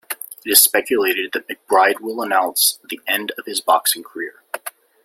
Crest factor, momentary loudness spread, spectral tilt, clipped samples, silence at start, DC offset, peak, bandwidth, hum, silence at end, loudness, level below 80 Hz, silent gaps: 20 dB; 18 LU; 0 dB/octave; under 0.1%; 0.1 s; under 0.1%; 0 dBFS; 17 kHz; none; 0.35 s; -17 LUFS; -68 dBFS; none